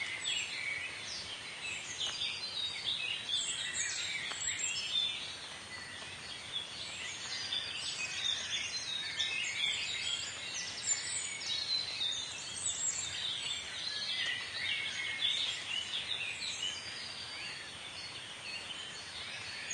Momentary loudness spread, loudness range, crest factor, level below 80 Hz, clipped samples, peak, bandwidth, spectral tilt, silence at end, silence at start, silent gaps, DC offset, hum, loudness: 9 LU; 4 LU; 18 dB; -72 dBFS; under 0.1%; -20 dBFS; 11.5 kHz; 1 dB/octave; 0 s; 0 s; none; under 0.1%; none; -36 LUFS